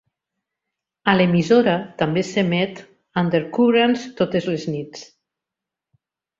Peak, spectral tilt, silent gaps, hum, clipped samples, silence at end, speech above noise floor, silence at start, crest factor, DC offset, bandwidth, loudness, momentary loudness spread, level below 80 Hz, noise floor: 0 dBFS; -6.5 dB/octave; none; none; under 0.1%; 1.35 s; 67 dB; 1.05 s; 20 dB; under 0.1%; 7.6 kHz; -20 LUFS; 12 LU; -60 dBFS; -86 dBFS